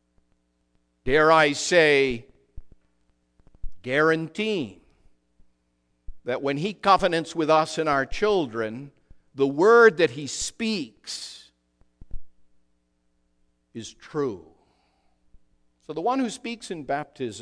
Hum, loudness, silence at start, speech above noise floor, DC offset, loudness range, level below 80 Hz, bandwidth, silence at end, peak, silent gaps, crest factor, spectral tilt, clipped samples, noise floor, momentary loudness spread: none; -23 LUFS; 1.05 s; 48 dB; under 0.1%; 16 LU; -48 dBFS; 10.5 kHz; 0 s; -4 dBFS; none; 22 dB; -4 dB/octave; under 0.1%; -71 dBFS; 19 LU